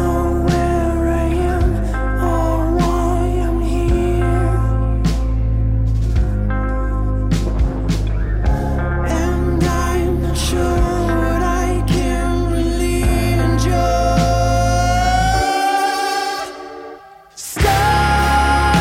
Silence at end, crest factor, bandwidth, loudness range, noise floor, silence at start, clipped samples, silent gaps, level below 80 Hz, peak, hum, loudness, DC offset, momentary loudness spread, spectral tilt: 0 s; 12 dB; 16 kHz; 3 LU; -38 dBFS; 0 s; under 0.1%; none; -20 dBFS; -4 dBFS; none; -17 LUFS; under 0.1%; 5 LU; -6 dB/octave